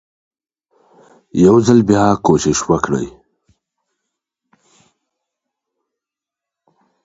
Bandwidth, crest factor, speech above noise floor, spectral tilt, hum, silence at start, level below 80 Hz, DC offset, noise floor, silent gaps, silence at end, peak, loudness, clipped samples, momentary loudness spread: 8 kHz; 18 dB; 73 dB; -6 dB/octave; none; 1.35 s; -46 dBFS; under 0.1%; -86 dBFS; none; 3.95 s; 0 dBFS; -13 LUFS; under 0.1%; 11 LU